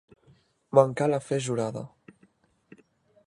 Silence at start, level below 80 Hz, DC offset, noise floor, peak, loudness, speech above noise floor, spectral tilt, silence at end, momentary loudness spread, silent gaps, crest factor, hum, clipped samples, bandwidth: 0.75 s; -68 dBFS; under 0.1%; -64 dBFS; -4 dBFS; -26 LUFS; 40 dB; -6 dB/octave; 1.4 s; 15 LU; none; 26 dB; none; under 0.1%; 11.5 kHz